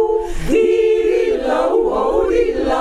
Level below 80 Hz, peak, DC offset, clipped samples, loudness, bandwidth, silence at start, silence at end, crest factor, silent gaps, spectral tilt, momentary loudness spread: -30 dBFS; -4 dBFS; under 0.1%; under 0.1%; -16 LUFS; 12 kHz; 0 s; 0 s; 12 dB; none; -5.5 dB/octave; 4 LU